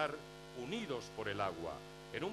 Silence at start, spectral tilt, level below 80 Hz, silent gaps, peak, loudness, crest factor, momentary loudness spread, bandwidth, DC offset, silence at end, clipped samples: 0 s; -5 dB/octave; -66 dBFS; none; -22 dBFS; -43 LUFS; 20 dB; 10 LU; 14 kHz; under 0.1%; 0 s; under 0.1%